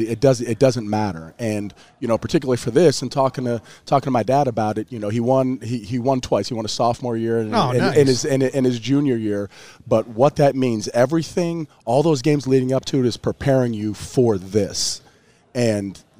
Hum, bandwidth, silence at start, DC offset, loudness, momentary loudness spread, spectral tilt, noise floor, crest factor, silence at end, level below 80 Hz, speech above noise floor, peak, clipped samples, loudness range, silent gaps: none; 15.5 kHz; 0 s; 0.4%; -20 LUFS; 9 LU; -6 dB/octave; -54 dBFS; 18 dB; 0.2 s; -50 dBFS; 34 dB; -2 dBFS; under 0.1%; 2 LU; none